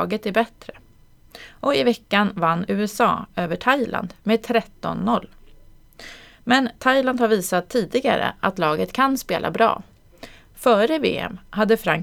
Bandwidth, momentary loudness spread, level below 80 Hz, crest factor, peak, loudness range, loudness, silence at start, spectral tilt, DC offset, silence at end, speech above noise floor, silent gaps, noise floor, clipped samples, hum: 19 kHz; 8 LU; -52 dBFS; 20 dB; -2 dBFS; 3 LU; -21 LUFS; 0 s; -5 dB/octave; under 0.1%; 0 s; 30 dB; none; -51 dBFS; under 0.1%; none